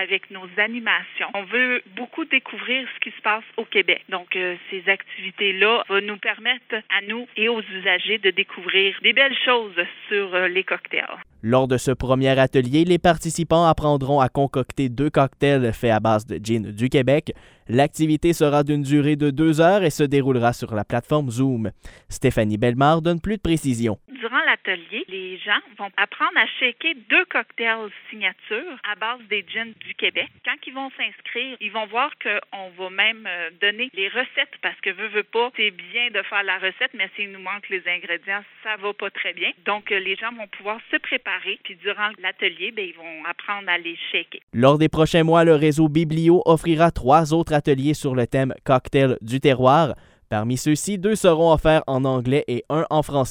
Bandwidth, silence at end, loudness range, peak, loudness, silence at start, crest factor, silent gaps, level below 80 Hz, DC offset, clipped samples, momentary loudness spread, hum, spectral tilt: 16 kHz; 0 s; 6 LU; -2 dBFS; -21 LUFS; 0 s; 18 dB; 44.43-44.47 s; -46 dBFS; under 0.1%; under 0.1%; 11 LU; none; -5.5 dB/octave